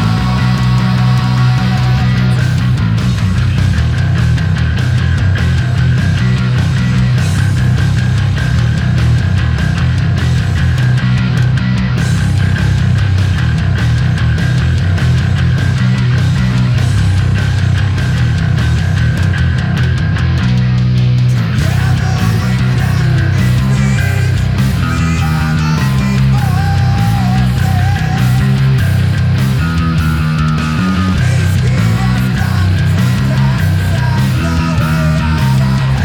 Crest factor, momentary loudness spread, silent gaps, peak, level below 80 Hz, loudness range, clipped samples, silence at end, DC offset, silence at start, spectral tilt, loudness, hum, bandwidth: 10 dB; 2 LU; none; -2 dBFS; -22 dBFS; 1 LU; under 0.1%; 0 s; under 0.1%; 0 s; -6.5 dB/octave; -12 LUFS; none; 15 kHz